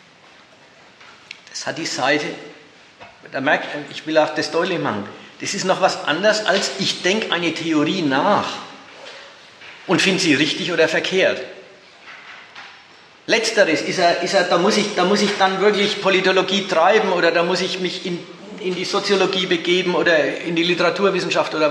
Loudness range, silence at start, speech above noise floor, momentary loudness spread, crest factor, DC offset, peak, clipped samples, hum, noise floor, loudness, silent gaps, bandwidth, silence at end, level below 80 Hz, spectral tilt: 6 LU; 1 s; 29 dB; 20 LU; 18 dB; under 0.1%; -2 dBFS; under 0.1%; none; -48 dBFS; -18 LUFS; none; 12.5 kHz; 0 s; -72 dBFS; -3.5 dB/octave